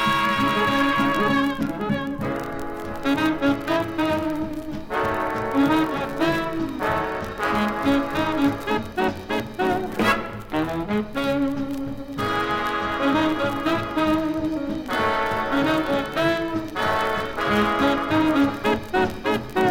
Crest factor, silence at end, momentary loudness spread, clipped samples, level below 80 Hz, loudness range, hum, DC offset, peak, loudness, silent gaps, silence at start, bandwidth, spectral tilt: 16 dB; 0 s; 8 LU; under 0.1%; -46 dBFS; 3 LU; none; under 0.1%; -6 dBFS; -23 LUFS; none; 0 s; 17 kHz; -5.5 dB/octave